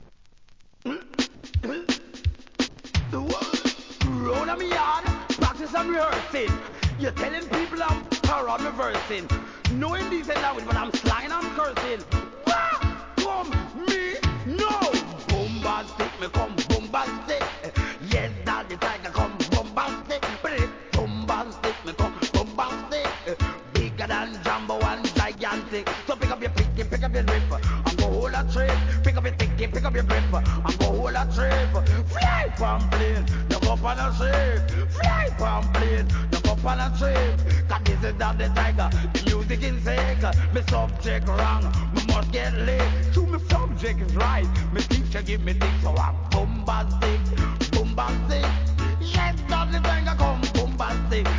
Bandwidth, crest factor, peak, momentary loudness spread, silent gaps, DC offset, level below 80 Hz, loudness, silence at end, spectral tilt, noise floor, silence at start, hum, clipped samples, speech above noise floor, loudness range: 7.6 kHz; 16 dB; -6 dBFS; 6 LU; none; 0.2%; -26 dBFS; -25 LUFS; 0 s; -5.5 dB/octave; -51 dBFS; 0 s; none; under 0.1%; 29 dB; 4 LU